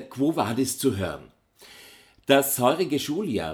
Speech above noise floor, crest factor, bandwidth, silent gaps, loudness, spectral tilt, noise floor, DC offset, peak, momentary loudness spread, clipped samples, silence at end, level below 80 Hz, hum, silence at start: 27 dB; 22 dB; over 20 kHz; none; -24 LUFS; -4.5 dB/octave; -51 dBFS; under 0.1%; -4 dBFS; 11 LU; under 0.1%; 0 s; -58 dBFS; none; 0 s